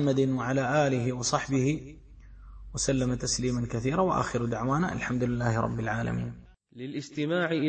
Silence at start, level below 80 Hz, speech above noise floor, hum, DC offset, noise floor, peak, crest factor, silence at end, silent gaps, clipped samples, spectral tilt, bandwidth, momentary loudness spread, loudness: 0 s; -48 dBFS; 21 dB; none; under 0.1%; -49 dBFS; -10 dBFS; 18 dB; 0 s; none; under 0.1%; -5.5 dB/octave; 8.8 kHz; 10 LU; -28 LUFS